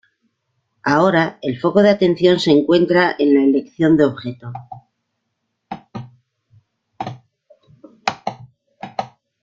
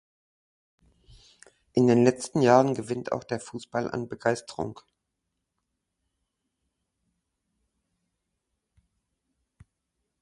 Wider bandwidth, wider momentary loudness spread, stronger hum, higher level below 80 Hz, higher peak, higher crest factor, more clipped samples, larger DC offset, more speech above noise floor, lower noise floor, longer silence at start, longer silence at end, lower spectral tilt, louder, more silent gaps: second, 7.8 kHz vs 11.5 kHz; first, 21 LU vs 14 LU; neither; first, -58 dBFS vs -66 dBFS; about the same, -2 dBFS vs -4 dBFS; second, 18 dB vs 26 dB; neither; neither; about the same, 59 dB vs 57 dB; second, -74 dBFS vs -82 dBFS; second, 0.85 s vs 1.75 s; second, 0.35 s vs 5.5 s; about the same, -6.5 dB/octave vs -6.5 dB/octave; first, -16 LUFS vs -26 LUFS; neither